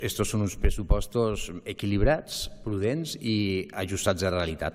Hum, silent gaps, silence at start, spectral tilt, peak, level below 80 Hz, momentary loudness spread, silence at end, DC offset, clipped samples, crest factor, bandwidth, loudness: none; none; 0 s; -5 dB/octave; -8 dBFS; -32 dBFS; 7 LU; 0 s; under 0.1%; under 0.1%; 18 dB; 16.5 kHz; -28 LUFS